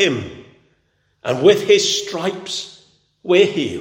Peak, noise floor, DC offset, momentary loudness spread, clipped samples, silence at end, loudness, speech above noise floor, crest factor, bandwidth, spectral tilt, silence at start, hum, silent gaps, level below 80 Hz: 0 dBFS; -64 dBFS; under 0.1%; 18 LU; under 0.1%; 0 s; -17 LUFS; 48 dB; 18 dB; 16.5 kHz; -3.5 dB/octave; 0 s; none; none; -62 dBFS